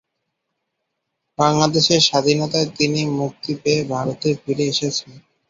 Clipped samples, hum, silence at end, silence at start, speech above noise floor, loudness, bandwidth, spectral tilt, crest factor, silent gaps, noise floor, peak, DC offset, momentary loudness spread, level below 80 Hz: under 0.1%; none; 0.3 s; 1.4 s; 58 dB; -18 LUFS; 7.8 kHz; -4 dB/octave; 18 dB; none; -76 dBFS; -2 dBFS; under 0.1%; 10 LU; -58 dBFS